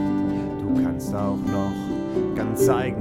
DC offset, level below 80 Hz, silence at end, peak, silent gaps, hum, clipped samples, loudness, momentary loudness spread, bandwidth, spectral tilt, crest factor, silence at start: under 0.1%; -44 dBFS; 0 s; -6 dBFS; none; none; under 0.1%; -24 LUFS; 6 LU; 16.5 kHz; -7 dB/octave; 16 dB; 0 s